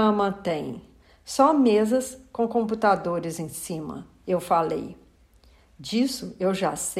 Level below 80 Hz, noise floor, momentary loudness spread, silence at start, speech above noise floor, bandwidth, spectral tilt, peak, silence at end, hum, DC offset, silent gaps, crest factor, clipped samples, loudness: -58 dBFS; -56 dBFS; 15 LU; 0 s; 32 dB; 16 kHz; -5 dB/octave; -8 dBFS; 0 s; none; under 0.1%; none; 18 dB; under 0.1%; -25 LUFS